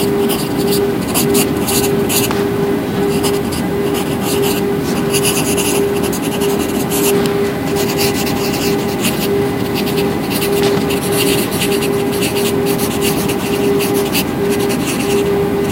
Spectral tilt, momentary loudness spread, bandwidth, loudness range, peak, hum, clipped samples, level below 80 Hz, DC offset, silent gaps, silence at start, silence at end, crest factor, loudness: -4.5 dB/octave; 3 LU; 16 kHz; 1 LU; 0 dBFS; none; under 0.1%; -38 dBFS; under 0.1%; none; 0 s; 0 s; 14 dB; -15 LUFS